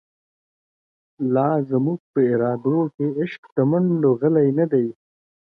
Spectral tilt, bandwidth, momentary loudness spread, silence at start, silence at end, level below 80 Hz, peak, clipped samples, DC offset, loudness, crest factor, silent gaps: -11.5 dB/octave; 4.9 kHz; 6 LU; 1.2 s; 0.65 s; -68 dBFS; -6 dBFS; under 0.1%; under 0.1%; -21 LUFS; 16 dB; 2.00-2.14 s, 2.94-2.98 s, 3.38-3.43 s, 3.52-3.56 s